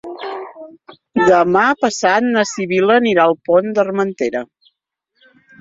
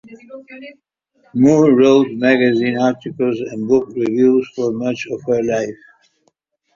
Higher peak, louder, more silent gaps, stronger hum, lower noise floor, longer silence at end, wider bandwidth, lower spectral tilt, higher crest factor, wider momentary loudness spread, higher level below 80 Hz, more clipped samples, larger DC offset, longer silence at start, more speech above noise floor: about the same, 0 dBFS vs -2 dBFS; about the same, -15 LUFS vs -16 LUFS; neither; neither; first, -70 dBFS vs -64 dBFS; first, 1.15 s vs 1 s; about the same, 7.8 kHz vs 7.4 kHz; second, -4.5 dB/octave vs -6.5 dB/octave; about the same, 16 dB vs 16 dB; about the same, 15 LU vs 15 LU; about the same, -58 dBFS vs -58 dBFS; neither; neither; about the same, 0.05 s vs 0.1 s; first, 56 dB vs 49 dB